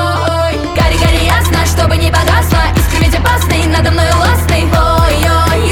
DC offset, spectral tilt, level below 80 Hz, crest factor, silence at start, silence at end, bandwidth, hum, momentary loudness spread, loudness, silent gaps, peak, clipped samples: under 0.1%; -5 dB/octave; -16 dBFS; 10 dB; 0 s; 0 s; 17.5 kHz; none; 3 LU; -11 LUFS; none; 0 dBFS; under 0.1%